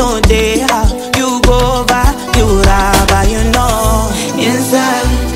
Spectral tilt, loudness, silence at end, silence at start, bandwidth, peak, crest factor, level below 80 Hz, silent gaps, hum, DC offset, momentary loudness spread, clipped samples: -4.5 dB/octave; -11 LUFS; 0 s; 0 s; 16.5 kHz; 0 dBFS; 10 dB; -16 dBFS; none; none; under 0.1%; 4 LU; under 0.1%